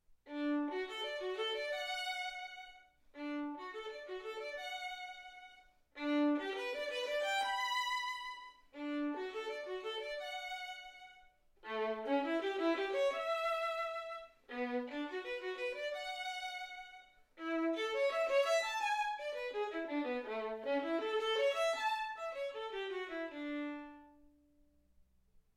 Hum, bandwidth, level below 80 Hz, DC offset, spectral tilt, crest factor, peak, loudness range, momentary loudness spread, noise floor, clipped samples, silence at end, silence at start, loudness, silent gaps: none; 16 kHz; -74 dBFS; under 0.1%; -2 dB/octave; 18 dB; -22 dBFS; 7 LU; 14 LU; -70 dBFS; under 0.1%; 1.4 s; 0.1 s; -39 LUFS; none